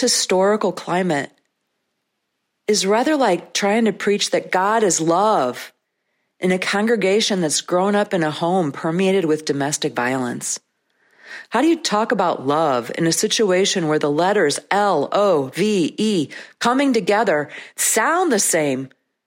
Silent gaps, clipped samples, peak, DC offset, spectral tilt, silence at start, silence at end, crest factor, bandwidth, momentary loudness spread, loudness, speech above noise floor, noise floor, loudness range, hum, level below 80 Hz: none; under 0.1%; -4 dBFS; under 0.1%; -3.5 dB/octave; 0 s; 0.4 s; 16 dB; 16.5 kHz; 7 LU; -18 LUFS; 56 dB; -75 dBFS; 3 LU; none; -70 dBFS